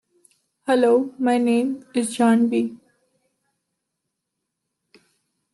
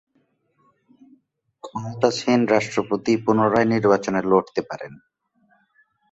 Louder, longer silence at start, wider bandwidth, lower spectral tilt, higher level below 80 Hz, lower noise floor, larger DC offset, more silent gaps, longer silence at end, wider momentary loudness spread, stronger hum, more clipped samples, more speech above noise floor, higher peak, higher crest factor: about the same, -20 LUFS vs -20 LUFS; second, 0.65 s vs 1.65 s; first, 12 kHz vs 8 kHz; about the same, -5 dB/octave vs -6 dB/octave; second, -76 dBFS vs -60 dBFS; first, -80 dBFS vs -67 dBFS; neither; neither; first, 2.75 s vs 1.15 s; second, 8 LU vs 16 LU; neither; neither; first, 61 dB vs 47 dB; second, -6 dBFS vs -2 dBFS; about the same, 16 dB vs 20 dB